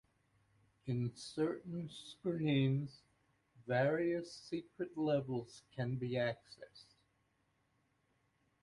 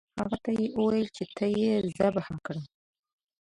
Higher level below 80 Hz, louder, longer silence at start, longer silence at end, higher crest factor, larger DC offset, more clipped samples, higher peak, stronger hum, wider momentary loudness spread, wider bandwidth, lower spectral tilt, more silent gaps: second, -74 dBFS vs -60 dBFS; second, -39 LUFS vs -29 LUFS; first, 0.85 s vs 0.15 s; first, 1.8 s vs 0.75 s; about the same, 18 dB vs 18 dB; neither; neither; second, -22 dBFS vs -12 dBFS; neither; first, 16 LU vs 11 LU; about the same, 11.5 kHz vs 10.5 kHz; about the same, -7 dB/octave vs -7 dB/octave; neither